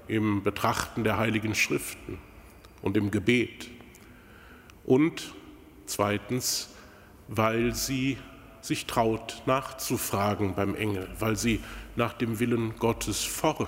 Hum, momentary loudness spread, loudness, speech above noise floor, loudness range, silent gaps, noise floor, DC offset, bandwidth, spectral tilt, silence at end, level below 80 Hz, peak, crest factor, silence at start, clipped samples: none; 15 LU; -28 LUFS; 23 dB; 2 LU; none; -51 dBFS; under 0.1%; 16 kHz; -4.5 dB/octave; 0 s; -50 dBFS; -8 dBFS; 20 dB; 0 s; under 0.1%